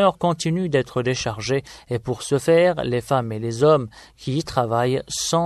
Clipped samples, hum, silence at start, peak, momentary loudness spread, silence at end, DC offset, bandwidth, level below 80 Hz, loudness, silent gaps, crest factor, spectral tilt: under 0.1%; none; 0 s; -4 dBFS; 10 LU; 0 s; under 0.1%; 13 kHz; -50 dBFS; -21 LUFS; none; 18 dB; -5 dB/octave